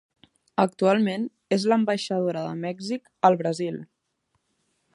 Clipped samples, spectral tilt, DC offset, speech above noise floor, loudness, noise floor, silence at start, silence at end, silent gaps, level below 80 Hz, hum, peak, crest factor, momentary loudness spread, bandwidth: under 0.1%; -6 dB/octave; under 0.1%; 51 dB; -25 LUFS; -75 dBFS; 0.6 s; 1.1 s; none; -74 dBFS; none; -4 dBFS; 22 dB; 11 LU; 11.5 kHz